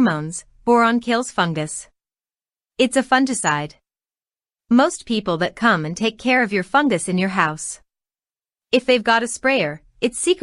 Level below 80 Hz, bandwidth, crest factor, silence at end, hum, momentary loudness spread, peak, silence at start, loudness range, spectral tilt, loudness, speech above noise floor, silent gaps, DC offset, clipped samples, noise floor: -56 dBFS; 11.5 kHz; 18 dB; 0.05 s; none; 10 LU; -2 dBFS; 0 s; 3 LU; -4 dB/octave; -19 LUFS; over 71 dB; none; under 0.1%; under 0.1%; under -90 dBFS